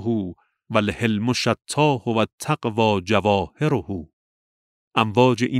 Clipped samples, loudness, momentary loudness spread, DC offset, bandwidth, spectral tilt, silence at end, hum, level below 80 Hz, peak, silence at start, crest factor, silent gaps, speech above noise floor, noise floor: under 0.1%; -21 LUFS; 8 LU; under 0.1%; 14.5 kHz; -5.5 dB/octave; 0 s; none; -52 dBFS; -2 dBFS; 0 s; 20 dB; 2.33-2.38 s, 4.13-4.91 s; over 69 dB; under -90 dBFS